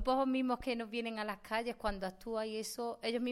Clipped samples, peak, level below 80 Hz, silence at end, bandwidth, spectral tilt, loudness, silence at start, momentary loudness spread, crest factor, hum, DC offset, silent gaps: under 0.1%; -22 dBFS; -54 dBFS; 0 s; 16 kHz; -4 dB/octave; -38 LUFS; 0 s; 7 LU; 16 dB; none; under 0.1%; none